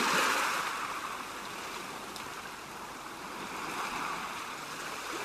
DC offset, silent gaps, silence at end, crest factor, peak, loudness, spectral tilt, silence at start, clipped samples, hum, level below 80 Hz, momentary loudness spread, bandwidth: under 0.1%; none; 0 s; 20 dB; -16 dBFS; -35 LUFS; -1.5 dB/octave; 0 s; under 0.1%; none; -66 dBFS; 13 LU; 14 kHz